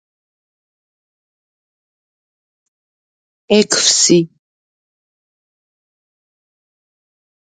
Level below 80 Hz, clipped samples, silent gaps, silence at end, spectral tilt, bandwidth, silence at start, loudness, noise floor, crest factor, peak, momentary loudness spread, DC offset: -64 dBFS; under 0.1%; none; 3.2 s; -2.5 dB/octave; 9.6 kHz; 3.5 s; -12 LUFS; under -90 dBFS; 22 dB; 0 dBFS; 6 LU; under 0.1%